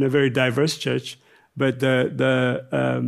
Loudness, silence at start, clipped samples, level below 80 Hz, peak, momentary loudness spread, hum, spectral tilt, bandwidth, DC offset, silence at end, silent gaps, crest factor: -22 LUFS; 0 s; under 0.1%; -64 dBFS; -6 dBFS; 6 LU; none; -6 dB/octave; 13.5 kHz; under 0.1%; 0 s; none; 14 dB